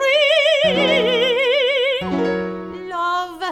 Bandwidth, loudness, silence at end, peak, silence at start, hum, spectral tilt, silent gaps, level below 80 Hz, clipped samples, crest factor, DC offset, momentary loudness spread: 14 kHz; -17 LUFS; 0 s; -6 dBFS; 0 s; none; -4 dB/octave; none; -52 dBFS; under 0.1%; 12 dB; under 0.1%; 10 LU